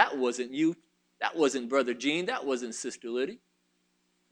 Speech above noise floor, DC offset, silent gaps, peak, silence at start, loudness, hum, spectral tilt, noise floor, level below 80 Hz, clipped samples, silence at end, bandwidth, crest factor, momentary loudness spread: 44 dB; under 0.1%; none; -6 dBFS; 0 s; -30 LUFS; 60 Hz at -55 dBFS; -3.5 dB/octave; -74 dBFS; -82 dBFS; under 0.1%; 0.95 s; 11 kHz; 24 dB; 9 LU